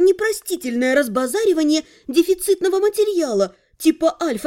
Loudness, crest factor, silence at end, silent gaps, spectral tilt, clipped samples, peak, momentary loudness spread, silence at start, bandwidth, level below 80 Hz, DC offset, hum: -19 LUFS; 14 dB; 0 s; none; -3.5 dB/octave; under 0.1%; -4 dBFS; 4 LU; 0 s; 17 kHz; -56 dBFS; under 0.1%; none